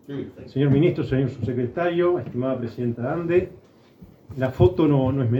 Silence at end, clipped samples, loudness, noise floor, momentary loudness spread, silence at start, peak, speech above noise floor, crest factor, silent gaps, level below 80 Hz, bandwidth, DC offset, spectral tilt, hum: 0 s; under 0.1%; -22 LUFS; -49 dBFS; 11 LU; 0.1 s; -4 dBFS; 27 dB; 20 dB; none; -44 dBFS; 5.6 kHz; under 0.1%; -10 dB/octave; none